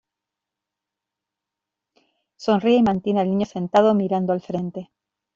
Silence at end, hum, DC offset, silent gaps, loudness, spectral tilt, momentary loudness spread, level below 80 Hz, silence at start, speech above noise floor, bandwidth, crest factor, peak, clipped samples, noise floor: 0.5 s; none; under 0.1%; none; -21 LUFS; -7.5 dB/octave; 11 LU; -60 dBFS; 2.4 s; 66 dB; 7.4 kHz; 20 dB; -4 dBFS; under 0.1%; -86 dBFS